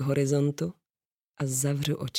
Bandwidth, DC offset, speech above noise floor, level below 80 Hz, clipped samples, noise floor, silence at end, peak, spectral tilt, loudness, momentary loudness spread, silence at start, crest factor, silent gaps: 16.5 kHz; under 0.1%; over 63 dB; -64 dBFS; under 0.1%; under -90 dBFS; 0 s; -14 dBFS; -5 dB/octave; -28 LUFS; 9 LU; 0 s; 16 dB; 1.11-1.17 s, 1.24-1.28 s